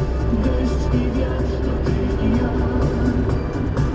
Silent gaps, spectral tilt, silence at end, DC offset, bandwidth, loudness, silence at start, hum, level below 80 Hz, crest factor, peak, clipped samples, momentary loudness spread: none; -8.5 dB/octave; 0 s; under 0.1%; 8 kHz; -21 LUFS; 0 s; none; -24 dBFS; 12 dB; -6 dBFS; under 0.1%; 3 LU